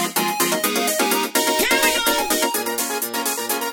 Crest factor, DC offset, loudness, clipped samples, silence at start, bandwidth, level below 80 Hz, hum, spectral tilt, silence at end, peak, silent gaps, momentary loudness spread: 18 dB; under 0.1%; -19 LUFS; under 0.1%; 0 s; over 20 kHz; -52 dBFS; none; -1 dB/octave; 0 s; -2 dBFS; none; 6 LU